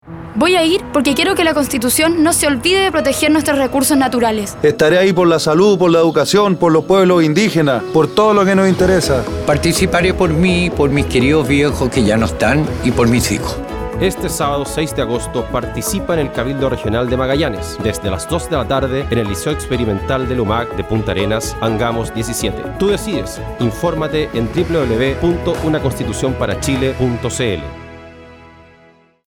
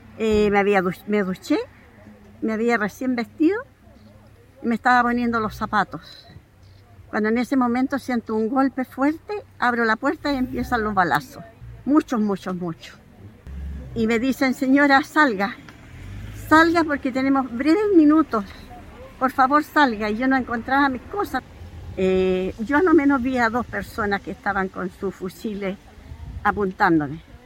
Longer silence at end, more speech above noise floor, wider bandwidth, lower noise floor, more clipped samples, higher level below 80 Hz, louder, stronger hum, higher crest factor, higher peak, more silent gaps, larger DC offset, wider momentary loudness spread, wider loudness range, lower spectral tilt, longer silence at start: first, 0.9 s vs 0.1 s; first, 34 dB vs 29 dB; about the same, 18 kHz vs 17 kHz; about the same, -49 dBFS vs -49 dBFS; neither; first, -32 dBFS vs -44 dBFS; first, -15 LUFS vs -21 LUFS; neither; second, 12 dB vs 20 dB; about the same, -2 dBFS vs -2 dBFS; neither; neither; second, 8 LU vs 18 LU; about the same, 6 LU vs 5 LU; about the same, -5 dB/octave vs -6 dB/octave; about the same, 0.05 s vs 0.1 s